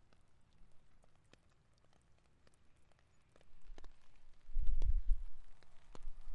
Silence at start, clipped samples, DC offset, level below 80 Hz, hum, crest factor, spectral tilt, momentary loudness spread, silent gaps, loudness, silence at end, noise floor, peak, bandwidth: 0.6 s; under 0.1%; under 0.1%; -42 dBFS; none; 20 dB; -6.5 dB/octave; 23 LU; none; -44 LUFS; 0 s; -70 dBFS; -18 dBFS; 1.9 kHz